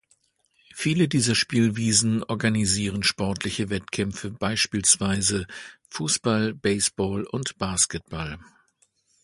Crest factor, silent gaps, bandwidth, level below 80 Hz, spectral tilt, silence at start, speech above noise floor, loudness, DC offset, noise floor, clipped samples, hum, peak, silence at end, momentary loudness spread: 22 dB; none; 11.5 kHz; -50 dBFS; -3.5 dB/octave; 0.75 s; 42 dB; -23 LUFS; under 0.1%; -67 dBFS; under 0.1%; none; -4 dBFS; 0.8 s; 12 LU